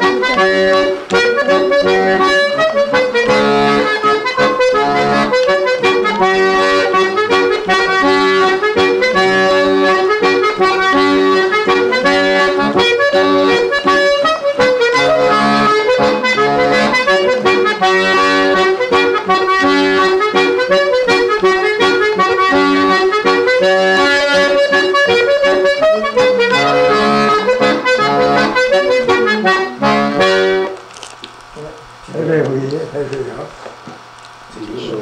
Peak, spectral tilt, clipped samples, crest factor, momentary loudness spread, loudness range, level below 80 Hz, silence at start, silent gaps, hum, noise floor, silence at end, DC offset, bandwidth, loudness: -2 dBFS; -4 dB/octave; under 0.1%; 10 dB; 4 LU; 3 LU; -46 dBFS; 0 s; none; none; -36 dBFS; 0 s; under 0.1%; 11.5 kHz; -12 LUFS